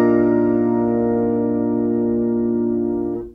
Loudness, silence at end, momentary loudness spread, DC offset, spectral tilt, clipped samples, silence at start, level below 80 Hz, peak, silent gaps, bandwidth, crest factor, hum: -19 LUFS; 0 s; 4 LU; under 0.1%; -11.5 dB/octave; under 0.1%; 0 s; -46 dBFS; -6 dBFS; none; 2.8 kHz; 12 dB; none